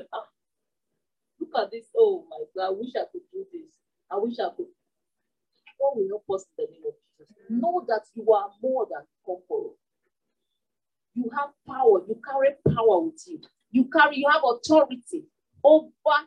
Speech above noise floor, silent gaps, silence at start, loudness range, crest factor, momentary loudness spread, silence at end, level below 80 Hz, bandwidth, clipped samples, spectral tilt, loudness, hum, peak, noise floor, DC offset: 65 dB; none; 0.1 s; 10 LU; 20 dB; 19 LU; 0.05 s; -72 dBFS; 10.5 kHz; under 0.1%; -6 dB/octave; -24 LUFS; none; -6 dBFS; -89 dBFS; under 0.1%